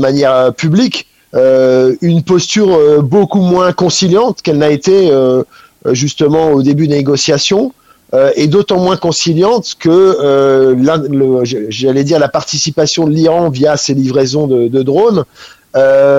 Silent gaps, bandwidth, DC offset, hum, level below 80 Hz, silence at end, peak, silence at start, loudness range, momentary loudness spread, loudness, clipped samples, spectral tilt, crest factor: none; 8.6 kHz; 0.1%; none; -48 dBFS; 0 s; 0 dBFS; 0 s; 2 LU; 6 LU; -10 LUFS; under 0.1%; -5.5 dB/octave; 10 dB